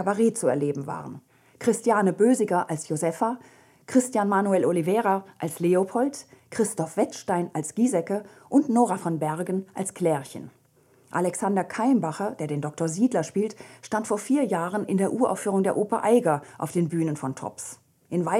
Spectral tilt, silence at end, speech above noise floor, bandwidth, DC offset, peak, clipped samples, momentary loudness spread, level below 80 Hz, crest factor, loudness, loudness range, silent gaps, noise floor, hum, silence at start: -6 dB/octave; 0 s; 36 dB; 15.5 kHz; under 0.1%; -8 dBFS; under 0.1%; 10 LU; -74 dBFS; 18 dB; -25 LUFS; 3 LU; none; -60 dBFS; none; 0 s